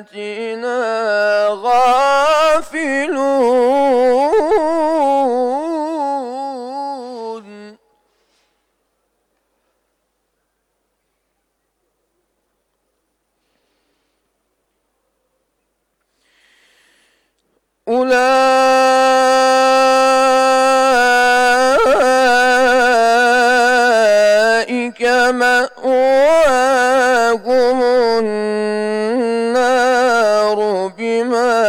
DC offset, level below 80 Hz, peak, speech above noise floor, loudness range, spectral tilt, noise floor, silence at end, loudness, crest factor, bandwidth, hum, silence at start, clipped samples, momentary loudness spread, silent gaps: under 0.1%; -52 dBFS; -6 dBFS; 52 dB; 11 LU; -2.5 dB/octave; -69 dBFS; 0 s; -13 LUFS; 8 dB; 18 kHz; none; 0 s; under 0.1%; 9 LU; none